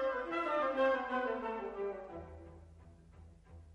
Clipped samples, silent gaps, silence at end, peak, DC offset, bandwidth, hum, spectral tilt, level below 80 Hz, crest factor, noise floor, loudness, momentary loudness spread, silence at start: under 0.1%; none; 0 s; -20 dBFS; under 0.1%; 7.8 kHz; none; -6 dB/octave; -62 dBFS; 18 dB; -58 dBFS; -36 LUFS; 23 LU; 0 s